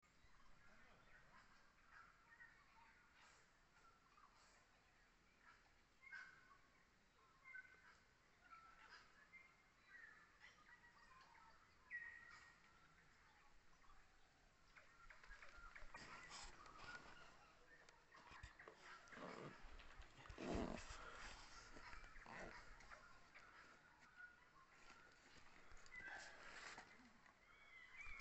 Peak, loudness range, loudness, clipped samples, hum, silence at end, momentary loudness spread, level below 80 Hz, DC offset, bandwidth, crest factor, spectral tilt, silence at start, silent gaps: -36 dBFS; 12 LU; -61 LUFS; under 0.1%; none; 0 s; 12 LU; -70 dBFS; under 0.1%; 8.2 kHz; 26 dB; -4 dB/octave; 0 s; none